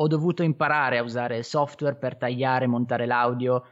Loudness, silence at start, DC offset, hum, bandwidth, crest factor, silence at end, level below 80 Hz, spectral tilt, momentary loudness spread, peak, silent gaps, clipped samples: -25 LUFS; 0 s; under 0.1%; none; 8 kHz; 14 dB; 0.1 s; -74 dBFS; -7 dB/octave; 6 LU; -10 dBFS; none; under 0.1%